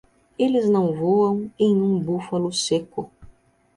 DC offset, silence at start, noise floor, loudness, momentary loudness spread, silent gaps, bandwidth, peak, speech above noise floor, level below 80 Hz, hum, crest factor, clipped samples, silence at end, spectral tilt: under 0.1%; 0.4 s; -52 dBFS; -21 LUFS; 7 LU; none; 11.5 kHz; -8 dBFS; 32 dB; -58 dBFS; none; 14 dB; under 0.1%; 0.5 s; -6 dB/octave